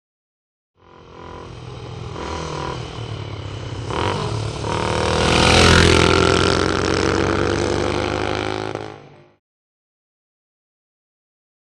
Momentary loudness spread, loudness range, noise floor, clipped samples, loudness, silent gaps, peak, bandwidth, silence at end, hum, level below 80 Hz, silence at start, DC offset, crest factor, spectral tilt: 21 LU; 16 LU; -42 dBFS; under 0.1%; -18 LUFS; none; 0 dBFS; 12 kHz; 2.55 s; none; -34 dBFS; 1 s; under 0.1%; 20 dB; -4.5 dB/octave